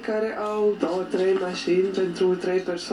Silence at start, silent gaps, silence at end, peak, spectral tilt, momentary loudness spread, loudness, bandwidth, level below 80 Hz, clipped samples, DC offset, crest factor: 0 s; none; 0 s; -8 dBFS; -5.5 dB/octave; 4 LU; -24 LUFS; 11 kHz; -62 dBFS; under 0.1%; under 0.1%; 14 dB